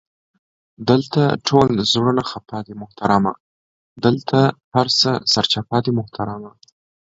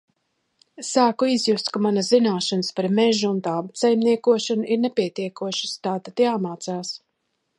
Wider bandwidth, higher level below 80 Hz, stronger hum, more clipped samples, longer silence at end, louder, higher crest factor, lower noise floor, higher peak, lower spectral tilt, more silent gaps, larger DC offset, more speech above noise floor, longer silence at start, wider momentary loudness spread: second, 7.8 kHz vs 11.5 kHz; first, -52 dBFS vs -74 dBFS; neither; neither; about the same, 0.65 s vs 0.6 s; first, -18 LUFS vs -22 LUFS; about the same, 20 dB vs 18 dB; first, under -90 dBFS vs -74 dBFS; first, 0 dBFS vs -4 dBFS; about the same, -5.5 dB/octave vs -4.5 dB/octave; first, 3.40-3.96 s, 4.64-4.72 s vs none; neither; first, over 72 dB vs 53 dB; about the same, 0.8 s vs 0.8 s; about the same, 12 LU vs 10 LU